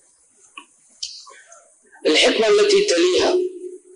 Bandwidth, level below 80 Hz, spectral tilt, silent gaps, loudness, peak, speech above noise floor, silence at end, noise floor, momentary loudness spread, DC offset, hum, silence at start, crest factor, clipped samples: 10.5 kHz; -60 dBFS; -2 dB/octave; none; -17 LUFS; -6 dBFS; 39 dB; 0.2 s; -55 dBFS; 18 LU; under 0.1%; none; 0.55 s; 14 dB; under 0.1%